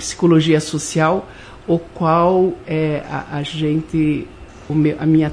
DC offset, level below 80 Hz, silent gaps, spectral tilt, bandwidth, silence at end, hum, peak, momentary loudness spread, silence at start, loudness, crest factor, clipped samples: under 0.1%; -44 dBFS; none; -6 dB/octave; 11 kHz; 0 s; none; -2 dBFS; 11 LU; 0 s; -18 LUFS; 16 dB; under 0.1%